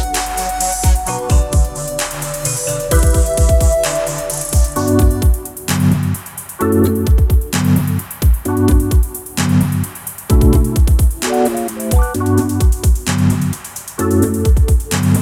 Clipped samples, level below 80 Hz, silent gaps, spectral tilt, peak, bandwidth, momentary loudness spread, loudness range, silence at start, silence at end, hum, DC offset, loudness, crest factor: under 0.1%; -16 dBFS; none; -5.5 dB/octave; 0 dBFS; 17 kHz; 7 LU; 1 LU; 0 s; 0 s; none; under 0.1%; -15 LUFS; 14 dB